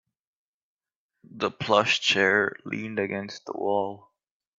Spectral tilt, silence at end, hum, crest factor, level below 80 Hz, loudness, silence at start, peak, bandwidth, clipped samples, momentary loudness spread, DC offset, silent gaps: -3.5 dB/octave; 0.6 s; none; 22 dB; -70 dBFS; -25 LUFS; 1.35 s; -6 dBFS; 7.8 kHz; under 0.1%; 13 LU; under 0.1%; none